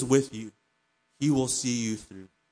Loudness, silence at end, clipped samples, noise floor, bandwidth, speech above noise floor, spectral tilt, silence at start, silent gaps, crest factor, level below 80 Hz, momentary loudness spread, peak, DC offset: -28 LUFS; 0.25 s; under 0.1%; -73 dBFS; 10.5 kHz; 46 dB; -4.5 dB/octave; 0 s; none; 20 dB; -62 dBFS; 21 LU; -10 dBFS; under 0.1%